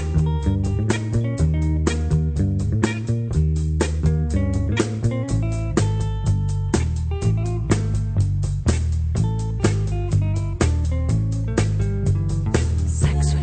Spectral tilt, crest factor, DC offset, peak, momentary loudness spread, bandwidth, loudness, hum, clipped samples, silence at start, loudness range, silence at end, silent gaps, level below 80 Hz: -7 dB/octave; 16 dB; under 0.1%; -4 dBFS; 2 LU; 9.2 kHz; -22 LUFS; none; under 0.1%; 0 s; 1 LU; 0 s; none; -26 dBFS